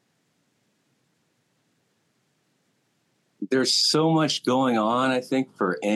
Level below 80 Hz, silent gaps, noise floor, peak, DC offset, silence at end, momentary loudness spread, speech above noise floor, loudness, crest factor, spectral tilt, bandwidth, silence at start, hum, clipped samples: -88 dBFS; none; -70 dBFS; -10 dBFS; under 0.1%; 0 s; 8 LU; 48 dB; -22 LUFS; 16 dB; -4 dB/octave; 12.5 kHz; 3.4 s; none; under 0.1%